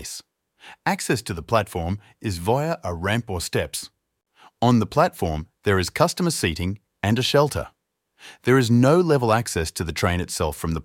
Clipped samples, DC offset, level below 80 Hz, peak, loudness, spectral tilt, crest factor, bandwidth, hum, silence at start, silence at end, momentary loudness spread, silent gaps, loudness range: under 0.1%; under 0.1%; -42 dBFS; -2 dBFS; -22 LUFS; -5 dB/octave; 20 dB; 17 kHz; none; 0 s; 0 s; 12 LU; none; 5 LU